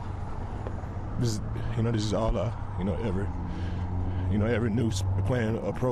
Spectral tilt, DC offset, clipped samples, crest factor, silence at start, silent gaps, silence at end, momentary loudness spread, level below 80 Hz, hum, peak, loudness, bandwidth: -7 dB/octave; under 0.1%; under 0.1%; 10 dB; 0 s; none; 0 s; 9 LU; -38 dBFS; none; -18 dBFS; -30 LUFS; 12.5 kHz